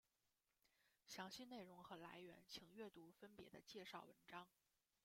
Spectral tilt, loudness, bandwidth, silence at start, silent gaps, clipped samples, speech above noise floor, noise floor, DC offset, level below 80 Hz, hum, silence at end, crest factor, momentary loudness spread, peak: -3.5 dB/octave; -60 LUFS; 16.5 kHz; 0.65 s; none; under 0.1%; over 30 dB; under -90 dBFS; under 0.1%; under -90 dBFS; none; 0.55 s; 22 dB; 8 LU; -40 dBFS